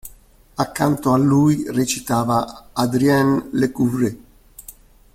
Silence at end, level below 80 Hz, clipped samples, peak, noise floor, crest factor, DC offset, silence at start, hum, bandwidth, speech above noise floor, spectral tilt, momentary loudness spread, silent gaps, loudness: 0.45 s; -48 dBFS; under 0.1%; -4 dBFS; -48 dBFS; 16 dB; under 0.1%; 0.05 s; none; 16.5 kHz; 30 dB; -6 dB/octave; 12 LU; none; -19 LUFS